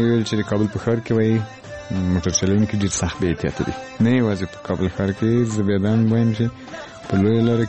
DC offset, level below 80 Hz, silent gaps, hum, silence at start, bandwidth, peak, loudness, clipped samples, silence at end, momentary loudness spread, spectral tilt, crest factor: under 0.1%; -44 dBFS; none; none; 0 s; 8.6 kHz; -6 dBFS; -20 LUFS; under 0.1%; 0 s; 9 LU; -6 dB/octave; 14 dB